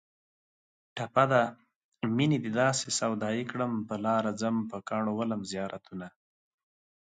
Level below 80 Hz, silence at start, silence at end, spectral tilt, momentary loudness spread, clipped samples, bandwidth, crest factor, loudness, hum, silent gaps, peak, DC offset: -70 dBFS; 0.95 s; 0.95 s; -5 dB/octave; 13 LU; under 0.1%; 9.4 kHz; 22 dB; -30 LUFS; none; 1.76-1.92 s; -10 dBFS; under 0.1%